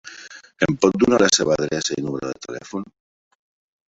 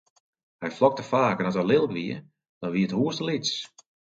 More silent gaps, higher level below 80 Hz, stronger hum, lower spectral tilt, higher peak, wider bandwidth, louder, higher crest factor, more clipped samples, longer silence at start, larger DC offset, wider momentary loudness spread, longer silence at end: second, none vs 2.49-2.61 s; first, -54 dBFS vs -68 dBFS; neither; second, -3.5 dB/octave vs -5.5 dB/octave; first, -2 dBFS vs -6 dBFS; about the same, 8.4 kHz vs 7.8 kHz; first, -20 LUFS vs -26 LUFS; about the same, 20 dB vs 20 dB; neither; second, 0.05 s vs 0.6 s; neither; first, 22 LU vs 13 LU; first, 1.05 s vs 0.5 s